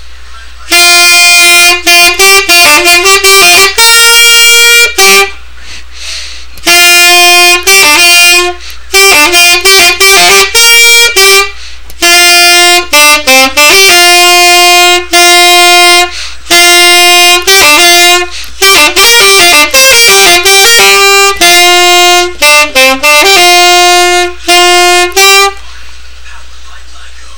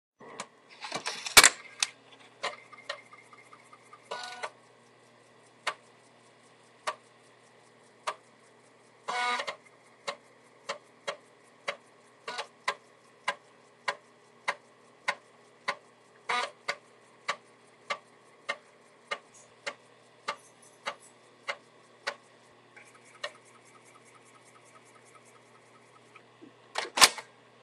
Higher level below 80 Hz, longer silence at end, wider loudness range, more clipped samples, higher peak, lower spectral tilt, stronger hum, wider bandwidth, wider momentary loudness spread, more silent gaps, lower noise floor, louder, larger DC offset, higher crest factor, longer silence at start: first, -32 dBFS vs -72 dBFS; second, 0 s vs 0.4 s; second, 2 LU vs 19 LU; first, 9% vs under 0.1%; about the same, 0 dBFS vs -2 dBFS; about the same, 0.5 dB/octave vs 1 dB/octave; neither; first, over 20 kHz vs 13 kHz; second, 6 LU vs 16 LU; neither; second, -29 dBFS vs -59 dBFS; first, -1 LUFS vs -31 LUFS; first, 6% vs under 0.1%; second, 4 dB vs 34 dB; about the same, 0.1 s vs 0.2 s